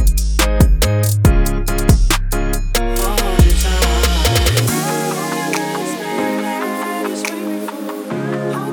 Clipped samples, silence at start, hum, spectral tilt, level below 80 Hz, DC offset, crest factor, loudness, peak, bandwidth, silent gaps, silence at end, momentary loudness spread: under 0.1%; 0 s; none; -4.5 dB/octave; -18 dBFS; under 0.1%; 14 dB; -17 LUFS; 0 dBFS; over 20 kHz; none; 0 s; 8 LU